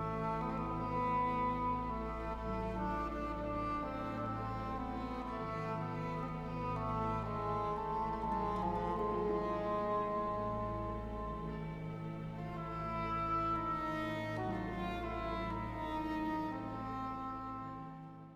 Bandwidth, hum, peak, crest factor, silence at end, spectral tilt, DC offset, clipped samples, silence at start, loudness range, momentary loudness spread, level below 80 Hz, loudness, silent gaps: 14 kHz; none; -26 dBFS; 14 dB; 0 s; -8 dB/octave; under 0.1%; under 0.1%; 0 s; 3 LU; 7 LU; -50 dBFS; -39 LUFS; none